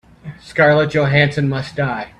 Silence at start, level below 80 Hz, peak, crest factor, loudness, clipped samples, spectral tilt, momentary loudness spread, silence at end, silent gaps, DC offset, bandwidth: 0.25 s; -46 dBFS; 0 dBFS; 16 dB; -16 LUFS; under 0.1%; -7 dB/octave; 10 LU; 0.1 s; none; under 0.1%; 9.8 kHz